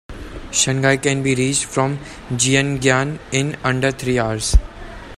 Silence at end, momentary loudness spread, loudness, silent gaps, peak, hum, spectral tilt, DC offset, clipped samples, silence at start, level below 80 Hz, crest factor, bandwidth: 0 s; 13 LU; -18 LUFS; none; 0 dBFS; none; -4 dB/octave; under 0.1%; under 0.1%; 0.1 s; -26 dBFS; 18 dB; 15 kHz